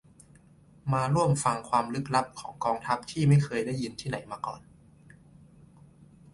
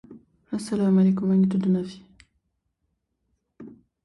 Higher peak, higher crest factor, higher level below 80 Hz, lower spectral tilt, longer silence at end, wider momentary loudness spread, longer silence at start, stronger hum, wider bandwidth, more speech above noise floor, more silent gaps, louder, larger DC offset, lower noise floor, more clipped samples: about the same, -10 dBFS vs -12 dBFS; first, 20 dB vs 14 dB; first, -58 dBFS vs -64 dBFS; second, -6 dB/octave vs -8.5 dB/octave; first, 1.75 s vs 0.35 s; about the same, 14 LU vs 14 LU; first, 0.85 s vs 0.1 s; neither; about the same, 11.5 kHz vs 11.5 kHz; second, 29 dB vs 55 dB; neither; second, -29 LUFS vs -23 LUFS; neither; second, -57 dBFS vs -76 dBFS; neither